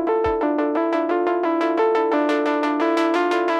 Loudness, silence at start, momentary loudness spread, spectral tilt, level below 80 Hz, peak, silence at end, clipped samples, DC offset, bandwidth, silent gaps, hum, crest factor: -20 LUFS; 0 s; 2 LU; -5.5 dB/octave; -50 dBFS; -8 dBFS; 0 s; under 0.1%; under 0.1%; 9.8 kHz; none; none; 12 dB